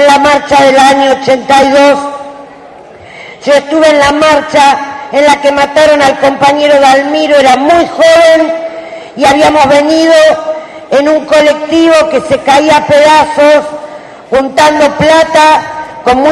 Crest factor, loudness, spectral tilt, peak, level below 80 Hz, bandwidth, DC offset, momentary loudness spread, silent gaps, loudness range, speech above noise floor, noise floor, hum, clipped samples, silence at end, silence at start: 6 dB; -6 LUFS; -3.5 dB/octave; 0 dBFS; -40 dBFS; 12 kHz; under 0.1%; 9 LU; none; 3 LU; 25 dB; -31 dBFS; none; 2%; 0 s; 0 s